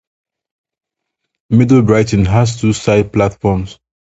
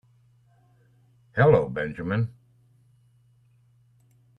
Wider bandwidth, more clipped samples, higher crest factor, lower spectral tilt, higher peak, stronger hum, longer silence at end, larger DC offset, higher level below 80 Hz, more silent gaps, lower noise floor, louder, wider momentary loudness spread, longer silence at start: first, 8 kHz vs 5.2 kHz; neither; second, 14 dB vs 24 dB; second, -7 dB/octave vs -9.5 dB/octave; first, 0 dBFS vs -4 dBFS; neither; second, 0.45 s vs 2.1 s; neither; first, -34 dBFS vs -56 dBFS; neither; first, -76 dBFS vs -61 dBFS; first, -13 LUFS vs -24 LUFS; second, 7 LU vs 13 LU; first, 1.5 s vs 1.35 s